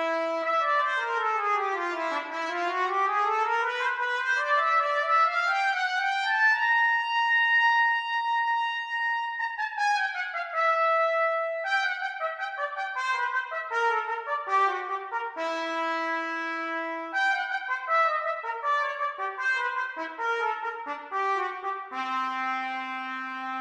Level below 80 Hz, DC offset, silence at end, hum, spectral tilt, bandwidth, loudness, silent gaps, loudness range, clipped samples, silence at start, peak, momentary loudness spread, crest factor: -82 dBFS; under 0.1%; 0 s; none; 0 dB/octave; 11.5 kHz; -26 LUFS; none; 6 LU; under 0.1%; 0 s; -12 dBFS; 9 LU; 14 dB